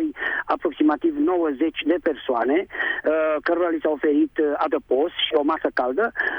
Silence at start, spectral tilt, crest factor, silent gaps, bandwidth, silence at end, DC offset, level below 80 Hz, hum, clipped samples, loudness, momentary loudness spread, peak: 0 s; -6 dB/octave; 14 dB; none; 5.4 kHz; 0 s; under 0.1%; -58 dBFS; none; under 0.1%; -22 LUFS; 3 LU; -8 dBFS